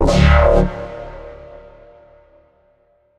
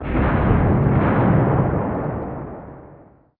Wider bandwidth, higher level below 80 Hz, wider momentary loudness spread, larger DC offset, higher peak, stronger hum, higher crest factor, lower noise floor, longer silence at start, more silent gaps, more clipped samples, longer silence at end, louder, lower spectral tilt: first, 9.6 kHz vs 4.1 kHz; first, -22 dBFS vs -30 dBFS; first, 25 LU vs 16 LU; neither; first, 0 dBFS vs -4 dBFS; neither; about the same, 18 dB vs 16 dB; first, -58 dBFS vs -47 dBFS; about the same, 0 s vs 0 s; neither; neither; first, 1.85 s vs 0.45 s; first, -14 LUFS vs -19 LUFS; second, -7 dB/octave vs -13 dB/octave